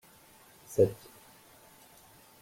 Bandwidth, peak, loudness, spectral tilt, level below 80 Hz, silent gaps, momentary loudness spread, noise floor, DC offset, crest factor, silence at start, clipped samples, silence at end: 16.5 kHz; -12 dBFS; -29 LUFS; -7 dB/octave; -64 dBFS; none; 27 LU; -58 dBFS; under 0.1%; 24 dB; 0.7 s; under 0.1%; 1.5 s